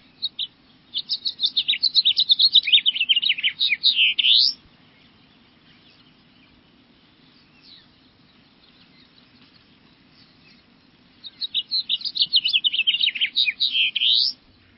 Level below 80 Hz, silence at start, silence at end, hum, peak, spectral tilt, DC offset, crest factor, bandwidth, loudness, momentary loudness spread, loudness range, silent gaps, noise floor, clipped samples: -70 dBFS; 0.2 s; 0.45 s; none; -4 dBFS; -1.5 dB/octave; under 0.1%; 20 dB; 5.8 kHz; -18 LUFS; 13 LU; 13 LU; none; -55 dBFS; under 0.1%